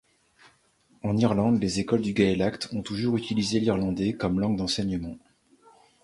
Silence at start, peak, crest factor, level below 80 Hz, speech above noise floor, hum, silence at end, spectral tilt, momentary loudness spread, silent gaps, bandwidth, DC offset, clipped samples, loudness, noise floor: 1.05 s; -8 dBFS; 18 dB; -50 dBFS; 38 dB; none; 0.85 s; -6 dB/octave; 9 LU; none; 11.5 kHz; under 0.1%; under 0.1%; -26 LUFS; -64 dBFS